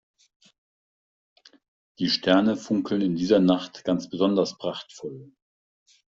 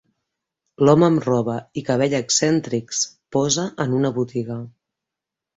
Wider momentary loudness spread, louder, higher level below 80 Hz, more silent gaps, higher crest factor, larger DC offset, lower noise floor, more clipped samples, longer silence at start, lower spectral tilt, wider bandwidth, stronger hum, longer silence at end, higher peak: first, 17 LU vs 12 LU; second, -24 LUFS vs -20 LUFS; second, -64 dBFS vs -58 dBFS; neither; about the same, 20 dB vs 18 dB; neither; first, under -90 dBFS vs -86 dBFS; neither; first, 2 s vs 0.8 s; first, -6 dB/octave vs -4.5 dB/octave; about the same, 7.6 kHz vs 8.2 kHz; neither; about the same, 0.85 s vs 0.9 s; second, -6 dBFS vs -2 dBFS